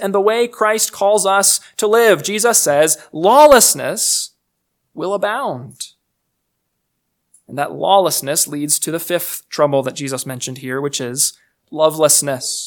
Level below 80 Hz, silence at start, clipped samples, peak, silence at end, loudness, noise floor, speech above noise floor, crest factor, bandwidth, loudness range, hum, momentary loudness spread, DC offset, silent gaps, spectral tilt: -54 dBFS; 0 s; 0.1%; 0 dBFS; 0 s; -15 LUFS; -72 dBFS; 57 dB; 16 dB; 19.5 kHz; 10 LU; none; 13 LU; under 0.1%; none; -2 dB/octave